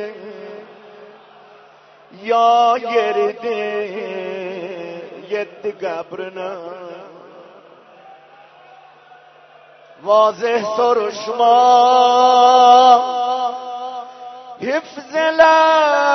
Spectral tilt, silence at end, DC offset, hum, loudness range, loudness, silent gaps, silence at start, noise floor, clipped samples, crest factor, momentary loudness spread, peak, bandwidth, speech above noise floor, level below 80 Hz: -3 dB/octave; 0 s; under 0.1%; none; 16 LU; -15 LUFS; none; 0 s; -46 dBFS; under 0.1%; 16 dB; 22 LU; 0 dBFS; 6.4 kHz; 32 dB; -66 dBFS